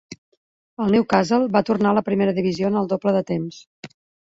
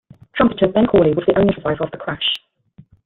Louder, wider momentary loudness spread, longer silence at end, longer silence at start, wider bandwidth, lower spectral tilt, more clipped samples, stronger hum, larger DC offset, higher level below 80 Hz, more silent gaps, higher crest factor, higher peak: second, -20 LUFS vs -17 LUFS; about the same, 9 LU vs 10 LU; second, 0.35 s vs 0.7 s; second, 0.1 s vs 0.35 s; first, 7.8 kHz vs 5.6 kHz; second, -7 dB/octave vs -8.5 dB/octave; neither; neither; neither; second, -58 dBFS vs -44 dBFS; first, 0.18-0.77 s, 3.67-3.83 s vs none; about the same, 18 dB vs 18 dB; second, -4 dBFS vs 0 dBFS